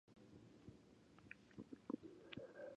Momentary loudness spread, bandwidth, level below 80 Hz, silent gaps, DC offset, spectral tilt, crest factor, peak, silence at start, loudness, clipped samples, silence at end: 15 LU; 9.6 kHz; -80 dBFS; none; under 0.1%; -6.5 dB/octave; 26 dB; -32 dBFS; 0.05 s; -58 LUFS; under 0.1%; 0 s